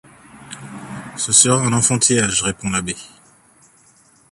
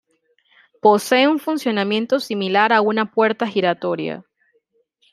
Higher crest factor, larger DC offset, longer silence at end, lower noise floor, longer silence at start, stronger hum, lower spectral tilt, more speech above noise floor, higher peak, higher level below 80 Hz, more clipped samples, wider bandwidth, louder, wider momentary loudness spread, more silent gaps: about the same, 20 dB vs 18 dB; neither; first, 1.25 s vs 0.9 s; second, -53 dBFS vs -65 dBFS; second, 0.35 s vs 0.85 s; neither; second, -3 dB/octave vs -4.5 dB/octave; second, 36 dB vs 47 dB; about the same, 0 dBFS vs -2 dBFS; first, -50 dBFS vs -72 dBFS; neither; about the same, 14 kHz vs 15 kHz; first, -15 LUFS vs -18 LUFS; first, 22 LU vs 8 LU; neither